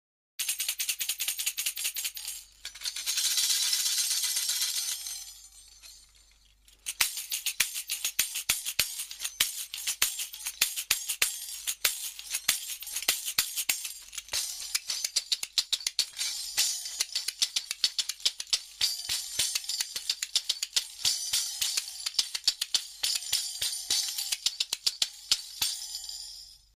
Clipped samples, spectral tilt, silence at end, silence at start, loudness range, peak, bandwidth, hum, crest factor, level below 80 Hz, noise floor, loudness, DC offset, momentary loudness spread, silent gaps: under 0.1%; 3.5 dB/octave; 0.2 s; 0.4 s; 3 LU; -6 dBFS; 15.5 kHz; none; 26 dB; -66 dBFS; -61 dBFS; -29 LUFS; under 0.1%; 9 LU; none